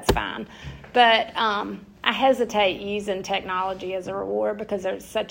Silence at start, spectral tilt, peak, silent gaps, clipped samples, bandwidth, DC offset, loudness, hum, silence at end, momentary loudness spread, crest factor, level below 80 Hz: 0 s; -4 dB/octave; -2 dBFS; none; under 0.1%; 16.5 kHz; under 0.1%; -23 LUFS; none; 0 s; 12 LU; 22 dB; -44 dBFS